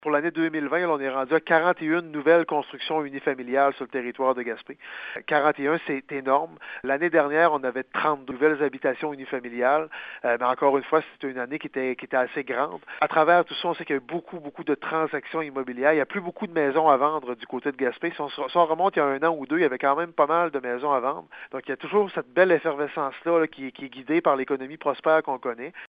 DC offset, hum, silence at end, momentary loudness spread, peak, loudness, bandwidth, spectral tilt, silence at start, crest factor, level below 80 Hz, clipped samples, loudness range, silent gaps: under 0.1%; none; 0 s; 11 LU; -4 dBFS; -25 LUFS; 5 kHz; -8.5 dB/octave; 0.05 s; 20 dB; -74 dBFS; under 0.1%; 2 LU; none